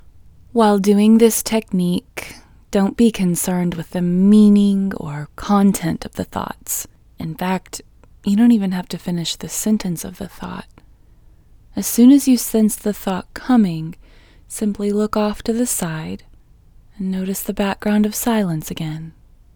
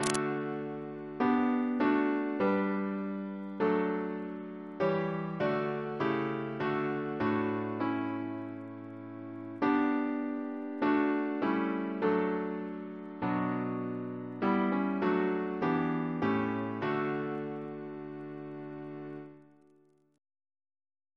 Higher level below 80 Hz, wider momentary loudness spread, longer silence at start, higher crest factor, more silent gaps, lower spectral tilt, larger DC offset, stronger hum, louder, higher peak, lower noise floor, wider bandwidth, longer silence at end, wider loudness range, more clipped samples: first, -44 dBFS vs -72 dBFS; first, 19 LU vs 14 LU; first, 0.55 s vs 0 s; second, 18 dB vs 24 dB; neither; about the same, -5.5 dB/octave vs -6.5 dB/octave; neither; neither; first, -18 LUFS vs -33 LUFS; first, 0 dBFS vs -8 dBFS; second, -47 dBFS vs -66 dBFS; first, over 20 kHz vs 11 kHz; second, 0.45 s vs 1.7 s; about the same, 6 LU vs 5 LU; neither